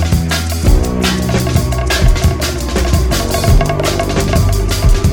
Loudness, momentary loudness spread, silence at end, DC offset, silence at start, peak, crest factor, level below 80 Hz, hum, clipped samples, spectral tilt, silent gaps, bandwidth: -14 LUFS; 3 LU; 0 s; under 0.1%; 0 s; 0 dBFS; 12 dB; -16 dBFS; none; under 0.1%; -5 dB/octave; none; over 20 kHz